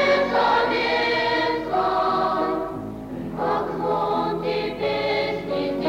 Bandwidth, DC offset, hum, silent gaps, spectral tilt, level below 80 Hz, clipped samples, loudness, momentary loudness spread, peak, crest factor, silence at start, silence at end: 16 kHz; under 0.1%; none; none; -5.5 dB/octave; -50 dBFS; under 0.1%; -23 LUFS; 8 LU; -8 dBFS; 14 dB; 0 s; 0 s